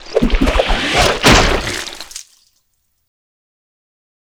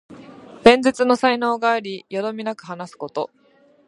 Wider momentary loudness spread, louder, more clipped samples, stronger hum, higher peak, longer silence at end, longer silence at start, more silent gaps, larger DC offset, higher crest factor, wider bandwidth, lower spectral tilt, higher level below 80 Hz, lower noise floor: about the same, 19 LU vs 18 LU; first, -13 LUFS vs -19 LUFS; neither; neither; about the same, 0 dBFS vs 0 dBFS; first, 2.15 s vs 0.6 s; about the same, 0 s vs 0.1 s; neither; neither; about the same, 16 dB vs 20 dB; first, over 20 kHz vs 11.5 kHz; about the same, -3.5 dB/octave vs -4.5 dB/octave; first, -24 dBFS vs -58 dBFS; first, -65 dBFS vs -41 dBFS